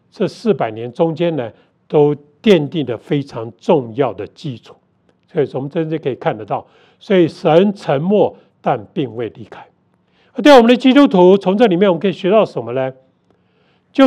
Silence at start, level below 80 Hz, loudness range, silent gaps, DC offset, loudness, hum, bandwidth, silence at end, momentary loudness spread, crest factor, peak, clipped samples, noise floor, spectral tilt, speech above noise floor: 0.2 s; -60 dBFS; 9 LU; none; under 0.1%; -15 LUFS; none; 11.5 kHz; 0 s; 15 LU; 16 dB; 0 dBFS; 0.2%; -58 dBFS; -7 dB/octave; 44 dB